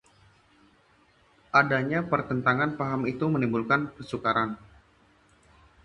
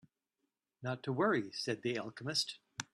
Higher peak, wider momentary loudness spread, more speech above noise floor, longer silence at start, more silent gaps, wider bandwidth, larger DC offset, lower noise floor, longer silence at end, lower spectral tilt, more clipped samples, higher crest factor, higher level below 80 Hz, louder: first, -6 dBFS vs -18 dBFS; second, 7 LU vs 10 LU; second, 36 dB vs 50 dB; first, 1.55 s vs 0.8 s; neither; second, 10.5 kHz vs 13 kHz; neither; second, -62 dBFS vs -87 dBFS; first, 1.3 s vs 0.1 s; first, -7.5 dB/octave vs -4 dB/octave; neither; about the same, 22 dB vs 20 dB; first, -60 dBFS vs -78 dBFS; first, -26 LUFS vs -37 LUFS